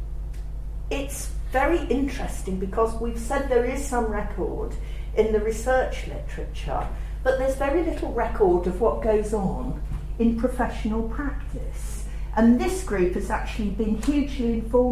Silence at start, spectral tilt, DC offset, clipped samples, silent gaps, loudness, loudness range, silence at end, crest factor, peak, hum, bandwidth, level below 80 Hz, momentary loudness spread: 0 s; -6.5 dB/octave; under 0.1%; under 0.1%; none; -25 LUFS; 3 LU; 0 s; 16 dB; -8 dBFS; none; 15 kHz; -30 dBFS; 12 LU